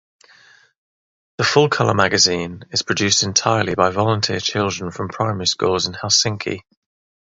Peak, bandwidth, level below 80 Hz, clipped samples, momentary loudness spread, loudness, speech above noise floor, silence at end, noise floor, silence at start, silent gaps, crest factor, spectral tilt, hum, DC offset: 0 dBFS; 8 kHz; -46 dBFS; under 0.1%; 9 LU; -18 LUFS; 32 dB; 0.6 s; -51 dBFS; 1.4 s; none; 20 dB; -3 dB/octave; none; under 0.1%